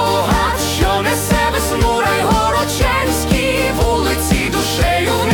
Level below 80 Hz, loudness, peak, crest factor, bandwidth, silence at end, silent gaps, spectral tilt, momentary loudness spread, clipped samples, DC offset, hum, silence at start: -24 dBFS; -15 LUFS; -4 dBFS; 12 dB; 19 kHz; 0 s; none; -4 dB/octave; 2 LU; under 0.1%; under 0.1%; none; 0 s